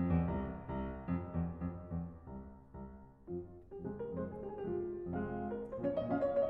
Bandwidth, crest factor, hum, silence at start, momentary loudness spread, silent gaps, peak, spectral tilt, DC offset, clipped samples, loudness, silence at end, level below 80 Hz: 4.2 kHz; 18 dB; none; 0 s; 16 LU; none; -22 dBFS; -11 dB/octave; under 0.1%; under 0.1%; -41 LUFS; 0 s; -52 dBFS